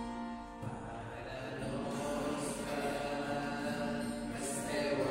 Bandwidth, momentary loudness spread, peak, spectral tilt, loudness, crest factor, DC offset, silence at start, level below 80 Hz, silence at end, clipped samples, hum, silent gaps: 16 kHz; 8 LU; -24 dBFS; -4.5 dB/octave; -39 LUFS; 16 dB; under 0.1%; 0 s; -56 dBFS; 0 s; under 0.1%; none; none